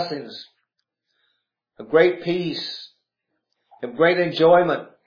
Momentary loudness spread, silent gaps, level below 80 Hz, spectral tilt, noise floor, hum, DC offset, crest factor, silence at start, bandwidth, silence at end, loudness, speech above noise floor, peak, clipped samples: 20 LU; none; -68 dBFS; -7 dB/octave; -78 dBFS; none; under 0.1%; 20 dB; 0 s; 5.4 kHz; 0.2 s; -19 LUFS; 58 dB; -4 dBFS; under 0.1%